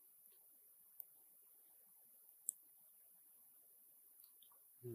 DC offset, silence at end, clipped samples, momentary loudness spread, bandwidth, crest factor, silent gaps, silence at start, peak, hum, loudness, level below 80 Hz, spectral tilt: under 0.1%; 0 s; under 0.1%; 16 LU; 15.5 kHz; 42 dB; none; 0 s; -18 dBFS; none; -58 LUFS; under -90 dBFS; -4 dB/octave